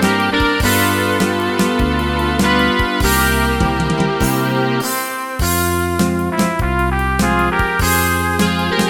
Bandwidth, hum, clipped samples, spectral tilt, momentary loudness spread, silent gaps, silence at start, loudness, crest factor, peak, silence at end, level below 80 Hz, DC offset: 17.5 kHz; none; under 0.1%; -4.5 dB/octave; 3 LU; none; 0 s; -16 LUFS; 14 dB; 0 dBFS; 0 s; -26 dBFS; under 0.1%